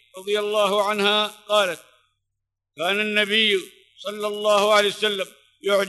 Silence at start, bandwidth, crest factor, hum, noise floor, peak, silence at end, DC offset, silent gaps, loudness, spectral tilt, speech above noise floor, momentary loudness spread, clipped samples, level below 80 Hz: 0.15 s; 12 kHz; 18 dB; none; -81 dBFS; -4 dBFS; 0 s; under 0.1%; none; -21 LUFS; -2.5 dB/octave; 60 dB; 12 LU; under 0.1%; -76 dBFS